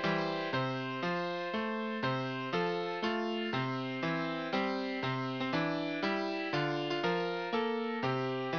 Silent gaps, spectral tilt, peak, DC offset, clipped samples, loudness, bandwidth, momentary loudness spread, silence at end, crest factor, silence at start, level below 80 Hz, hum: none; -6.5 dB/octave; -18 dBFS; under 0.1%; under 0.1%; -34 LUFS; 5.4 kHz; 2 LU; 0 s; 16 dB; 0 s; -78 dBFS; none